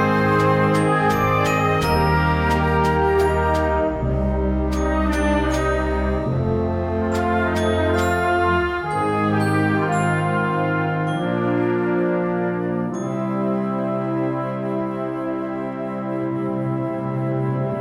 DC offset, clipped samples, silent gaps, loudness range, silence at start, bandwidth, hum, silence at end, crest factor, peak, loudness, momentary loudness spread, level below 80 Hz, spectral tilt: under 0.1%; under 0.1%; none; 6 LU; 0 s; 16 kHz; none; 0 s; 14 dB; -6 dBFS; -21 LUFS; 7 LU; -32 dBFS; -7 dB/octave